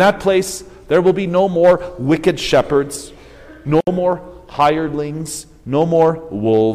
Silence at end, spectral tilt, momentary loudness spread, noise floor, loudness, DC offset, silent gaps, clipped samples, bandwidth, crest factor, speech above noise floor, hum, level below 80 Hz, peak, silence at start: 0 s; -5.5 dB/octave; 14 LU; -39 dBFS; -16 LUFS; under 0.1%; none; under 0.1%; 16 kHz; 14 dB; 24 dB; none; -42 dBFS; -2 dBFS; 0 s